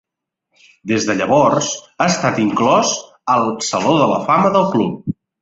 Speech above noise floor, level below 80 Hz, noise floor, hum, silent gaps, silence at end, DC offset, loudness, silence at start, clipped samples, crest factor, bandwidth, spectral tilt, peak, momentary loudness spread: 60 dB; -54 dBFS; -76 dBFS; none; none; 0.3 s; under 0.1%; -16 LUFS; 0.85 s; under 0.1%; 16 dB; 8 kHz; -4.5 dB/octave; -2 dBFS; 9 LU